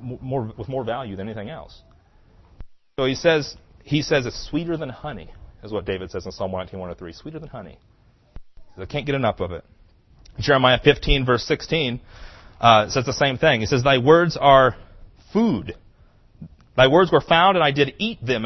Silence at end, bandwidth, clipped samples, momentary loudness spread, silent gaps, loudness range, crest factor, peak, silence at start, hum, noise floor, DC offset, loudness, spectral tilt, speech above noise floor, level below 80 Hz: 0 s; 6.2 kHz; under 0.1%; 21 LU; none; 14 LU; 22 dB; 0 dBFS; 0 s; none; -53 dBFS; under 0.1%; -20 LUFS; -5.5 dB/octave; 33 dB; -40 dBFS